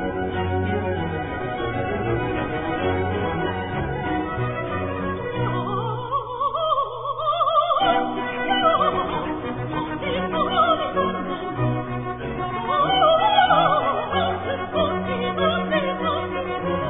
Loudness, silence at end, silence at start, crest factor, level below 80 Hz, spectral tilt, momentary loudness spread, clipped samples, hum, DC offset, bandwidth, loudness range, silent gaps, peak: -23 LUFS; 0 s; 0 s; 20 dB; -44 dBFS; -9.5 dB/octave; 9 LU; under 0.1%; none; under 0.1%; 3.9 kHz; 5 LU; none; -4 dBFS